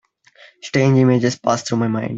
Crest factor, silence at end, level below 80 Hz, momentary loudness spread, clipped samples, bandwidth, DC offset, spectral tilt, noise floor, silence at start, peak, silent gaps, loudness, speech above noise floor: 16 dB; 0 s; -56 dBFS; 8 LU; under 0.1%; 8 kHz; under 0.1%; -6.5 dB/octave; -49 dBFS; 0.65 s; -2 dBFS; none; -17 LUFS; 32 dB